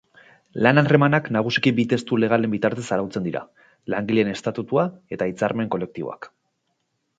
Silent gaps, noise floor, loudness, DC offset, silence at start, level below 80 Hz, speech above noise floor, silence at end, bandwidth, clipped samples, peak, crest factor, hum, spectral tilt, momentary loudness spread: none; -73 dBFS; -22 LUFS; under 0.1%; 0.55 s; -60 dBFS; 52 dB; 0.9 s; 9.2 kHz; under 0.1%; 0 dBFS; 22 dB; none; -6.5 dB/octave; 14 LU